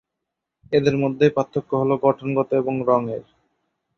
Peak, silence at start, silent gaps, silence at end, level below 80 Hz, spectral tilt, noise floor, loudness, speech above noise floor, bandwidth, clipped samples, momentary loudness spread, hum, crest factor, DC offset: -4 dBFS; 0.7 s; none; 0.75 s; -60 dBFS; -8 dB/octave; -82 dBFS; -21 LUFS; 62 dB; 6.8 kHz; under 0.1%; 5 LU; none; 18 dB; under 0.1%